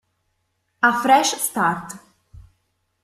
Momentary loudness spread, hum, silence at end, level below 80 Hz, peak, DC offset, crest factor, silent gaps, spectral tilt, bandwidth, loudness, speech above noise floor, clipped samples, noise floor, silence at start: 19 LU; none; 1.05 s; -58 dBFS; -2 dBFS; under 0.1%; 22 dB; none; -2.5 dB/octave; 15.5 kHz; -19 LUFS; 53 dB; under 0.1%; -71 dBFS; 0.8 s